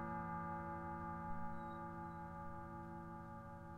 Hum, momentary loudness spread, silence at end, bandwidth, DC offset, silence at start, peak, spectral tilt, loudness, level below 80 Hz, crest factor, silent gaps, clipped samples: none; 7 LU; 0 s; 12 kHz; under 0.1%; 0 s; -34 dBFS; -9 dB/octave; -49 LUFS; -62 dBFS; 14 dB; none; under 0.1%